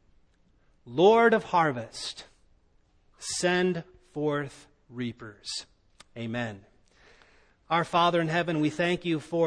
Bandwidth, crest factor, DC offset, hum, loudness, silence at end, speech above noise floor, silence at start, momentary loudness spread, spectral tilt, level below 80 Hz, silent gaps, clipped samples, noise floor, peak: 10.5 kHz; 20 dB; under 0.1%; none; -27 LUFS; 0 s; 38 dB; 0.85 s; 18 LU; -5 dB/octave; -62 dBFS; none; under 0.1%; -64 dBFS; -8 dBFS